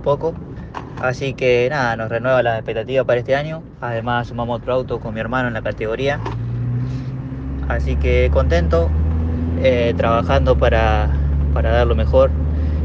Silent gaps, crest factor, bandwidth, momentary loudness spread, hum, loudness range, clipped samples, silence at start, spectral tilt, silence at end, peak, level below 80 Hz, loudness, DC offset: none; 16 dB; 6.6 kHz; 10 LU; none; 6 LU; under 0.1%; 0 s; -7.5 dB/octave; 0 s; 0 dBFS; -22 dBFS; -19 LUFS; under 0.1%